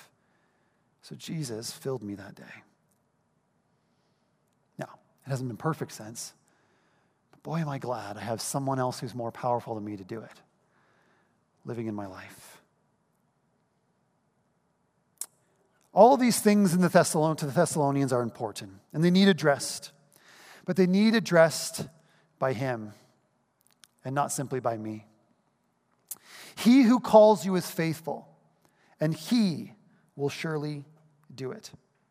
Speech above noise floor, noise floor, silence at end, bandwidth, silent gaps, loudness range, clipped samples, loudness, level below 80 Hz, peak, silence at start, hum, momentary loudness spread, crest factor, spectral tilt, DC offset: 46 dB; -72 dBFS; 0.45 s; 15.5 kHz; none; 18 LU; under 0.1%; -26 LUFS; -76 dBFS; -4 dBFS; 1.05 s; none; 22 LU; 24 dB; -5.5 dB/octave; under 0.1%